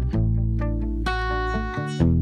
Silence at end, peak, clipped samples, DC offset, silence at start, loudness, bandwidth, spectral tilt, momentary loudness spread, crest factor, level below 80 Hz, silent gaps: 0 s; -8 dBFS; under 0.1%; under 0.1%; 0 s; -25 LUFS; 9.4 kHz; -7.5 dB/octave; 4 LU; 16 dB; -28 dBFS; none